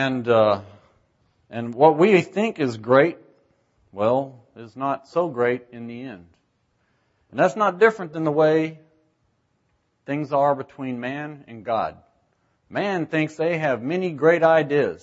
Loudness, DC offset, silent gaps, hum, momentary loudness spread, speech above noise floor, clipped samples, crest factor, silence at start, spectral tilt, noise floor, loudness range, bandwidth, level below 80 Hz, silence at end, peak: -21 LUFS; under 0.1%; none; none; 17 LU; 48 dB; under 0.1%; 20 dB; 0 s; -7 dB/octave; -69 dBFS; 7 LU; 8 kHz; -68 dBFS; 0.05 s; -2 dBFS